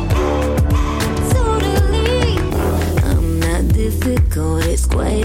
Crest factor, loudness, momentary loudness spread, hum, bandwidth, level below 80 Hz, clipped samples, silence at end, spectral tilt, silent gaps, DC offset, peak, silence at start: 10 dB; -17 LUFS; 2 LU; none; 16.5 kHz; -18 dBFS; under 0.1%; 0 s; -6 dB/octave; none; under 0.1%; -6 dBFS; 0 s